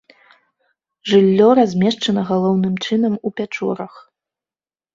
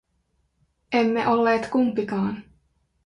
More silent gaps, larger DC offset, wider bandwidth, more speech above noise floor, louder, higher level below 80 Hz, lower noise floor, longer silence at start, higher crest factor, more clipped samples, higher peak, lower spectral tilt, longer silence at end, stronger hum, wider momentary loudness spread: neither; neither; second, 7.6 kHz vs 10 kHz; first, over 74 dB vs 48 dB; first, -16 LUFS vs -23 LUFS; about the same, -60 dBFS vs -60 dBFS; first, under -90 dBFS vs -70 dBFS; first, 1.05 s vs 0.9 s; about the same, 16 dB vs 16 dB; neither; first, -2 dBFS vs -8 dBFS; about the same, -6.5 dB/octave vs -6.5 dB/octave; first, 1.05 s vs 0.65 s; neither; first, 12 LU vs 7 LU